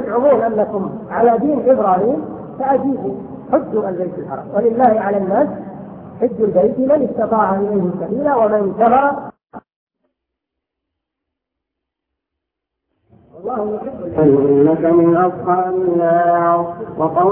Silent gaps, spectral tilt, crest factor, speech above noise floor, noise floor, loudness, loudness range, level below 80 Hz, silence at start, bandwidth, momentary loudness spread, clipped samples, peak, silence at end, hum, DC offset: 9.76-9.87 s; -13 dB/octave; 16 dB; 65 dB; -80 dBFS; -16 LUFS; 7 LU; -54 dBFS; 0 s; 3.6 kHz; 12 LU; under 0.1%; 0 dBFS; 0 s; none; under 0.1%